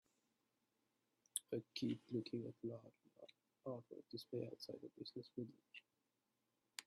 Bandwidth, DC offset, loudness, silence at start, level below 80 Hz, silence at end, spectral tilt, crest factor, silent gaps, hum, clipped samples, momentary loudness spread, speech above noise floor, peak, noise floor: 12.5 kHz; under 0.1%; -50 LUFS; 1.35 s; under -90 dBFS; 0.05 s; -4.5 dB/octave; 30 dB; none; none; under 0.1%; 17 LU; 39 dB; -22 dBFS; -89 dBFS